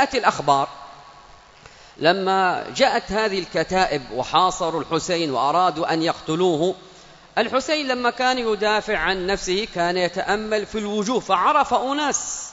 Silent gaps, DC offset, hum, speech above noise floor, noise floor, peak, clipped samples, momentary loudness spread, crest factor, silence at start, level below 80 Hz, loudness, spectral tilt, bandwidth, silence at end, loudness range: none; under 0.1%; none; 26 dB; -47 dBFS; -2 dBFS; under 0.1%; 6 LU; 18 dB; 0 s; -48 dBFS; -21 LUFS; -3.5 dB/octave; 8 kHz; 0 s; 1 LU